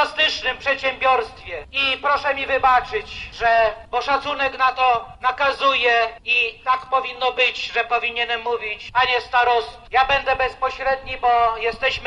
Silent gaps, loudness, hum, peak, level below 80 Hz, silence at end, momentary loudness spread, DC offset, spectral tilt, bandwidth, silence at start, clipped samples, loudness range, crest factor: none; -19 LUFS; none; -4 dBFS; -46 dBFS; 0 s; 6 LU; under 0.1%; -2.5 dB/octave; 10.5 kHz; 0 s; under 0.1%; 1 LU; 16 dB